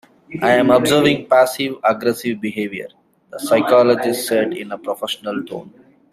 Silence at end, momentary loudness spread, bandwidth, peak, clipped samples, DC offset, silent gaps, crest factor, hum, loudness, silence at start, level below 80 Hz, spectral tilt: 0.45 s; 17 LU; 15.5 kHz; -2 dBFS; under 0.1%; under 0.1%; none; 16 dB; none; -17 LUFS; 0.3 s; -58 dBFS; -4.5 dB/octave